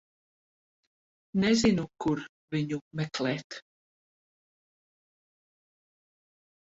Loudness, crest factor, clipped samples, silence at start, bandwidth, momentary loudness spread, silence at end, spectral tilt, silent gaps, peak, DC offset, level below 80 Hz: -29 LUFS; 20 dB; under 0.1%; 1.35 s; 8 kHz; 12 LU; 3.05 s; -5.5 dB/octave; 2.29-2.48 s, 2.81-2.91 s, 3.44-3.50 s; -12 dBFS; under 0.1%; -60 dBFS